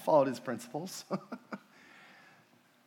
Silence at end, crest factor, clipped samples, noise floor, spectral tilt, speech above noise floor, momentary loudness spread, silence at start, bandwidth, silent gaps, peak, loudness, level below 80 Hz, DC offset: 1.3 s; 22 dB; under 0.1%; -65 dBFS; -5.5 dB/octave; 33 dB; 28 LU; 0 s; 17.5 kHz; none; -12 dBFS; -35 LUFS; under -90 dBFS; under 0.1%